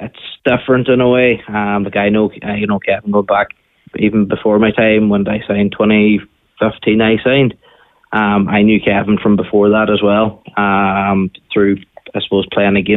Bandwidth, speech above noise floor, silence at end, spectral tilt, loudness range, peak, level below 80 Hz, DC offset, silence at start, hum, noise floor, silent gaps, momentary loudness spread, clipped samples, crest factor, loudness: 4 kHz; 36 dB; 0 s; -10 dB/octave; 2 LU; -2 dBFS; -44 dBFS; under 0.1%; 0 s; none; -49 dBFS; none; 7 LU; under 0.1%; 12 dB; -13 LUFS